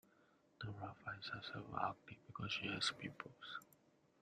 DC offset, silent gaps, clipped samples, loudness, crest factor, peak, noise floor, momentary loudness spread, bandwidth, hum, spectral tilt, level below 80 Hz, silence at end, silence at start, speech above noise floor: under 0.1%; none; under 0.1%; -46 LUFS; 24 dB; -24 dBFS; -74 dBFS; 13 LU; 13.5 kHz; none; -3.5 dB/octave; -76 dBFS; 0.45 s; 0.6 s; 27 dB